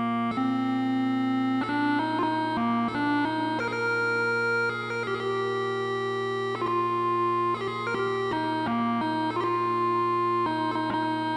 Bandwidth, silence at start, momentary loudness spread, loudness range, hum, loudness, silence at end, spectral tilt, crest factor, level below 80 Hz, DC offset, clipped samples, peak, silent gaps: 11.5 kHz; 0 s; 4 LU; 1 LU; none; -27 LUFS; 0 s; -6.5 dB/octave; 10 dB; -64 dBFS; under 0.1%; under 0.1%; -16 dBFS; none